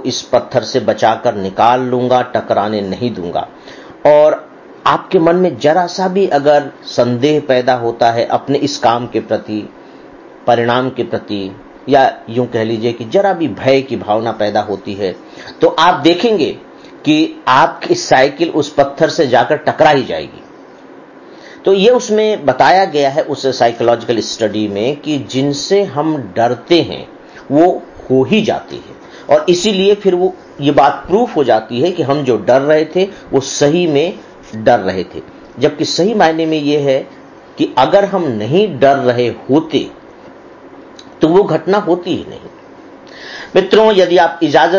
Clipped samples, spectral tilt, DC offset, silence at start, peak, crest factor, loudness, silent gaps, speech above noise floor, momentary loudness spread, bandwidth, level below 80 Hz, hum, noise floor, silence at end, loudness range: under 0.1%; -5 dB/octave; under 0.1%; 0 s; 0 dBFS; 14 dB; -13 LUFS; none; 24 dB; 11 LU; 7.4 kHz; -50 dBFS; none; -37 dBFS; 0 s; 3 LU